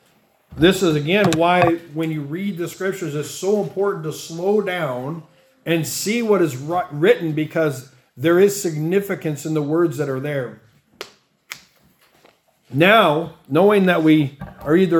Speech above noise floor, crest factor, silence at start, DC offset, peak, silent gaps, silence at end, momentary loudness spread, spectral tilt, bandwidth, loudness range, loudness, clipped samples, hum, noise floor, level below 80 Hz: 40 dB; 20 dB; 0.5 s; under 0.1%; 0 dBFS; none; 0 s; 16 LU; -5.5 dB/octave; 18 kHz; 6 LU; -19 LUFS; under 0.1%; none; -59 dBFS; -54 dBFS